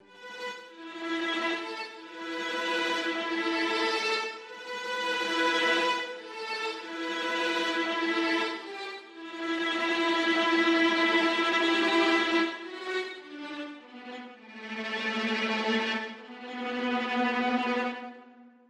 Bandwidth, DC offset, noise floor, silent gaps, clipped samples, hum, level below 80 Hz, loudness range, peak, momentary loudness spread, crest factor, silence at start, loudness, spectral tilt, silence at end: 12 kHz; under 0.1%; -53 dBFS; none; under 0.1%; none; -76 dBFS; 7 LU; -14 dBFS; 17 LU; 16 dB; 0.1 s; -28 LUFS; -2.5 dB/octave; 0.2 s